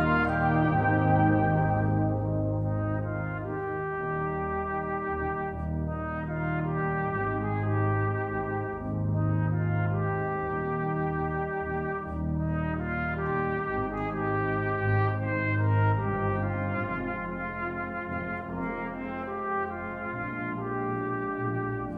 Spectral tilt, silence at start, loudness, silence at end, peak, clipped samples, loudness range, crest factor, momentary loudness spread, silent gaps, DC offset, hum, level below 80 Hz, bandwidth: -10.5 dB/octave; 0 s; -29 LUFS; 0 s; -12 dBFS; under 0.1%; 5 LU; 16 dB; 8 LU; none; under 0.1%; none; -44 dBFS; 4.4 kHz